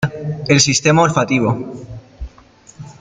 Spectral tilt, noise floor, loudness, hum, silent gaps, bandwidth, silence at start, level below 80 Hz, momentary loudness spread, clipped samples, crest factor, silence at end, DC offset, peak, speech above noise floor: -4 dB/octave; -46 dBFS; -14 LUFS; none; none; 9.6 kHz; 0 s; -40 dBFS; 24 LU; under 0.1%; 16 dB; 0.1 s; under 0.1%; -2 dBFS; 31 dB